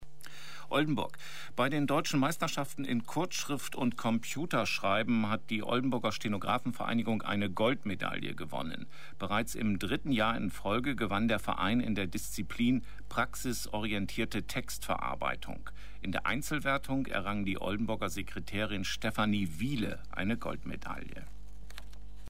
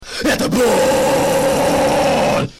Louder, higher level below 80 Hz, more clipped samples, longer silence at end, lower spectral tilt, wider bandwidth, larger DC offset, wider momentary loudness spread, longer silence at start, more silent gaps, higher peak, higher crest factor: second, -34 LUFS vs -15 LUFS; second, -52 dBFS vs -38 dBFS; neither; about the same, 0 s vs 0.05 s; about the same, -5 dB/octave vs -4 dB/octave; about the same, 16 kHz vs 16.5 kHz; first, 1% vs 0.3%; first, 12 LU vs 2 LU; about the same, 0 s vs 0 s; neither; second, -16 dBFS vs -8 dBFS; first, 16 dB vs 6 dB